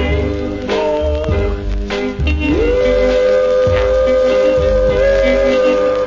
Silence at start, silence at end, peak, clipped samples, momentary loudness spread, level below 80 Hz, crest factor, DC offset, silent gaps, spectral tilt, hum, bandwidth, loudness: 0 s; 0 s; -2 dBFS; under 0.1%; 7 LU; -22 dBFS; 10 dB; under 0.1%; none; -6.5 dB/octave; none; 7.6 kHz; -14 LUFS